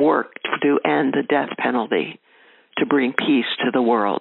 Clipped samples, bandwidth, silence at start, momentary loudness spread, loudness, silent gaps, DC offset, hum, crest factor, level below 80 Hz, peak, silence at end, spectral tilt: under 0.1%; 4.2 kHz; 0 s; 6 LU; -20 LUFS; none; under 0.1%; none; 20 dB; -74 dBFS; 0 dBFS; 0 s; -2.5 dB/octave